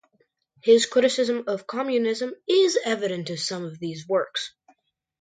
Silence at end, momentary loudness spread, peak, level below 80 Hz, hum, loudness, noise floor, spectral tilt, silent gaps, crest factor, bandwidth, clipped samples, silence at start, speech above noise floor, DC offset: 0.75 s; 12 LU; -6 dBFS; -76 dBFS; none; -24 LUFS; -68 dBFS; -3.5 dB/octave; none; 18 dB; 9.4 kHz; under 0.1%; 0.65 s; 45 dB; under 0.1%